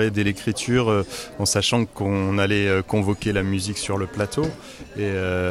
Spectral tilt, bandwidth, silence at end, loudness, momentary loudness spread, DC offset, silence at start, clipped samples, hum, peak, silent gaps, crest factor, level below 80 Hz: -5 dB/octave; 15 kHz; 0 s; -23 LUFS; 7 LU; under 0.1%; 0 s; under 0.1%; none; -8 dBFS; none; 14 dB; -46 dBFS